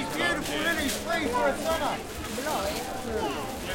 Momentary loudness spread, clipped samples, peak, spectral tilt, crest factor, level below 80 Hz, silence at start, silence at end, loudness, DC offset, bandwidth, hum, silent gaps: 6 LU; under 0.1%; -12 dBFS; -3 dB/octave; 16 dB; -46 dBFS; 0 s; 0 s; -29 LUFS; under 0.1%; 17 kHz; none; none